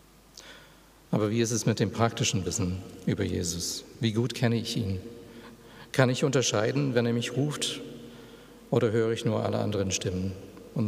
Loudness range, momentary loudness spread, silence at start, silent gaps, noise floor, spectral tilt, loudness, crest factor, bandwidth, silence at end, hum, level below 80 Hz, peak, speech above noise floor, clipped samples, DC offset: 2 LU; 22 LU; 0.35 s; none; -55 dBFS; -5 dB/octave; -28 LUFS; 22 dB; 15.5 kHz; 0 s; none; -62 dBFS; -6 dBFS; 27 dB; under 0.1%; under 0.1%